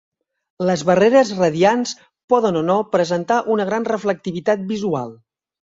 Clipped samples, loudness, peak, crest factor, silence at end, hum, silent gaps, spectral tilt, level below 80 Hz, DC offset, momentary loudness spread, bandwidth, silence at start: under 0.1%; -18 LUFS; -2 dBFS; 16 dB; 0.65 s; none; 2.24-2.28 s; -5.5 dB/octave; -60 dBFS; under 0.1%; 9 LU; 7.8 kHz; 0.6 s